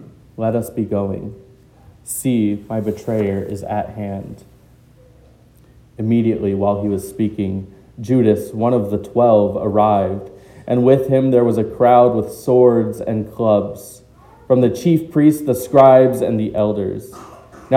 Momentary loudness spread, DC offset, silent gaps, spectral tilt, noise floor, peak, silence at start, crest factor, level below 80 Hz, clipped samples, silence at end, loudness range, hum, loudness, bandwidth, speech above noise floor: 14 LU; under 0.1%; none; -7.5 dB/octave; -48 dBFS; 0 dBFS; 0 s; 16 dB; -50 dBFS; under 0.1%; 0 s; 8 LU; none; -16 LUFS; 17 kHz; 32 dB